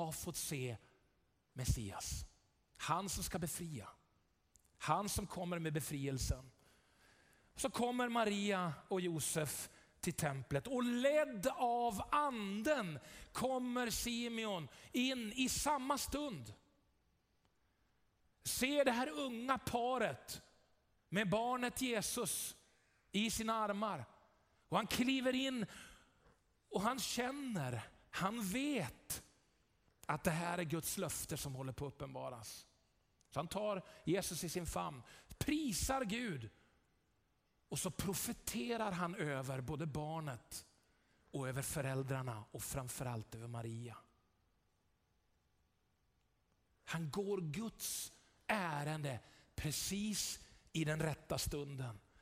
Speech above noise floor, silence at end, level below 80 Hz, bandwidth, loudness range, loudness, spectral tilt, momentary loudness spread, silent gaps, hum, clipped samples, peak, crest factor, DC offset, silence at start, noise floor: 39 dB; 0.2 s; -60 dBFS; 16 kHz; 6 LU; -41 LUFS; -4 dB/octave; 12 LU; none; none; under 0.1%; -20 dBFS; 22 dB; under 0.1%; 0 s; -80 dBFS